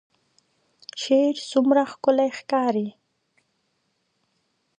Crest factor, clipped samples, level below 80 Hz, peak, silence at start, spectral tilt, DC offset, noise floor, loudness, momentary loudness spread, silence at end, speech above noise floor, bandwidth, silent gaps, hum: 20 dB; under 0.1%; -78 dBFS; -6 dBFS; 0.95 s; -4.5 dB/octave; under 0.1%; -72 dBFS; -22 LUFS; 14 LU; 1.9 s; 51 dB; 9.6 kHz; none; none